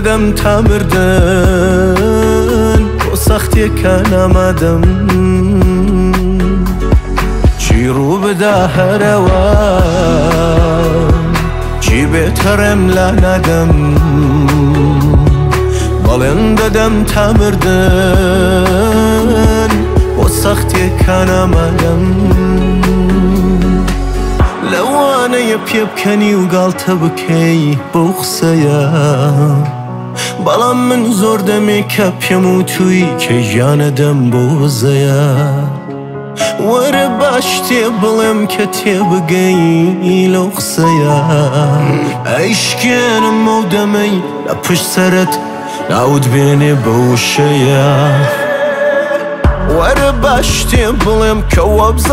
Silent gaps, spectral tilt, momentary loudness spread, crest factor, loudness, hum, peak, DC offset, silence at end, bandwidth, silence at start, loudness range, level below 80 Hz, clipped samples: none; -6 dB/octave; 4 LU; 10 dB; -10 LUFS; none; 0 dBFS; under 0.1%; 0 s; 16.5 kHz; 0 s; 2 LU; -18 dBFS; under 0.1%